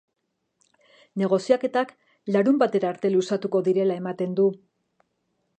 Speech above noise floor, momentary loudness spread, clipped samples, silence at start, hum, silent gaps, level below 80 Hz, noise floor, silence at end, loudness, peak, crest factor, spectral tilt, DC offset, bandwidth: 51 dB; 9 LU; under 0.1%; 1.15 s; none; none; -78 dBFS; -74 dBFS; 1 s; -24 LUFS; -6 dBFS; 20 dB; -7 dB/octave; under 0.1%; 9 kHz